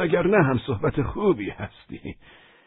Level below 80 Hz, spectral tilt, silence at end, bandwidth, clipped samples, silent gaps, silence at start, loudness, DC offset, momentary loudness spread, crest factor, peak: -44 dBFS; -12 dB/octave; 0.55 s; 4.2 kHz; under 0.1%; none; 0 s; -23 LUFS; under 0.1%; 19 LU; 18 dB; -6 dBFS